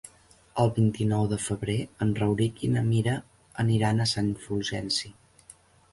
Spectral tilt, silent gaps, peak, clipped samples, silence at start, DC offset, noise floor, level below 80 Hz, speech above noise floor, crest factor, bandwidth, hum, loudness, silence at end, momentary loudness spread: -6 dB/octave; none; -12 dBFS; under 0.1%; 0.05 s; under 0.1%; -57 dBFS; -52 dBFS; 31 dB; 16 dB; 11.5 kHz; none; -27 LUFS; 0.8 s; 7 LU